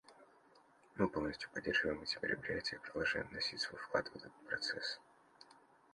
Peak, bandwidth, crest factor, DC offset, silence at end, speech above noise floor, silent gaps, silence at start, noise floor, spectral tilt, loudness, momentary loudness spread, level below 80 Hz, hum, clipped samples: -20 dBFS; 11.5 kHz; 24 dB; under 0.1%; 0.4 s; 27 dB; none; 0.1 s; -68 dBFS; -4 dB/octave; -40 LUFS; 8 LU; -66 dBFS; none; under 0.1%